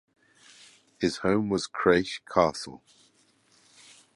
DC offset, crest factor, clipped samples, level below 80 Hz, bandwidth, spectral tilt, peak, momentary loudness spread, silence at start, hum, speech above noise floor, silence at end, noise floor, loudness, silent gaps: under 0.1%; 24 dB; under 0.1%; -58 dBFS; 11.5 kHz; -5 dB/octave; -6 dBFS; 8 LU; 1 s; none; 38 dB; 1.4 s; -64 dBFS; -26 LUFS; none